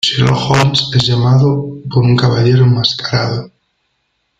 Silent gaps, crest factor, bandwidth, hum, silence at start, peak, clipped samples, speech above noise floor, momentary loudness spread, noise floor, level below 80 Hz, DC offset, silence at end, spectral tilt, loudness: none; 12 dB; 7.8 kHz; none; 0.05 s; 0 dBFS; under 0.1%; 54 dB; 7 LU; -65 dBFS; -42 dBFS; under 0.1%; 0.9 s; -6 dB/octave; -12 LUFS